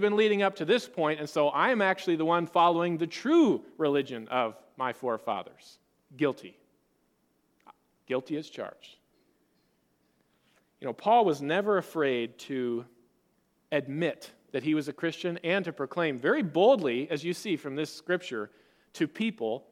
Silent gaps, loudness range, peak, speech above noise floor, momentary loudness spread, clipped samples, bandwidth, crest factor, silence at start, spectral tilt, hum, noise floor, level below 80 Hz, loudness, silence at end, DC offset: none; 14 LU; -10 dBFS; 44 dB; 12 LU; under 0.1%; 15 kHz; 20 dB; 0 s; -5.5 dB/octave; none; -72 dBFS; -80 dBFS; -29 LUFS; 0.1 s; under 0.1%